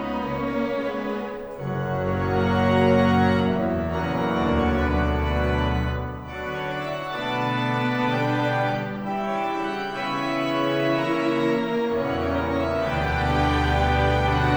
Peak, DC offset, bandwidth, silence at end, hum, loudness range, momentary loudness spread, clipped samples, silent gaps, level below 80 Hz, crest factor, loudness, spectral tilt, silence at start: -8 dBFS; under 0.1%; over 20 kHz; 0 s; none; 4 LU; 8 LU; under 0.1%; none; -34 dBFS; 16 dB; -24 LUFS; -7 dB/octave; 0 s